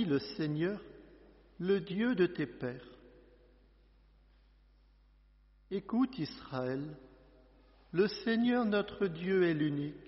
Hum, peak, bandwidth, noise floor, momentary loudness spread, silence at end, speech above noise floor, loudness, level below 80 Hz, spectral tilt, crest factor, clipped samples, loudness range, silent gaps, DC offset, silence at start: 50 Hz at -65 dBFS; -18 dBFS; 5.8 kHz; -64 dBFS; 12 LU; 0 s; 31 dB; -34 LUFS; -64 dBFS; -5.5 dB/octave; 18 dB; under 0.1%; 9 LU; none; under 0.1%; 0 s